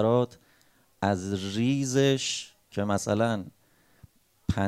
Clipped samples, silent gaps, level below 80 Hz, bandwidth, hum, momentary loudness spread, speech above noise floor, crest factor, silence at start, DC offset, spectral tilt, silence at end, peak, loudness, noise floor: under 0.1%; none; -56 dBFS; 15.5 kHz; none; 11 LU; 37 dB; 18 dB; 0 s; under 0.1%; -5 dB/octave; 0 s; -10 dBFS; -28 LUFS; -64 dBFS